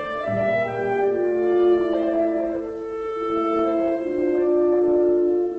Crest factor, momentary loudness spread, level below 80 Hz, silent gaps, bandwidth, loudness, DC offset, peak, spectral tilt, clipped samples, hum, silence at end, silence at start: 12 dB; 8 LU; -54 dBFS; none; 5 kHz; -21 LUFS; under 0.1%; -8 dBFS; -8 dB/octave; under 0.1%; none; 0 s; 0 s